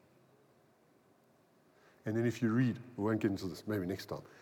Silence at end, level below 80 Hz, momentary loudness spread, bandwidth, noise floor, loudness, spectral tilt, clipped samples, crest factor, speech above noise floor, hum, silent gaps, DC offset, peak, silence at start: 0.15 s; -78 dBFS; 10 LU; 18 kHz; -68 dBFS; -36 LUFS; -7.5 dB/octave; under 0.1%; 18 dB; 33 dB; none; none; under 0.1%; -20 dBFS; 2.05 s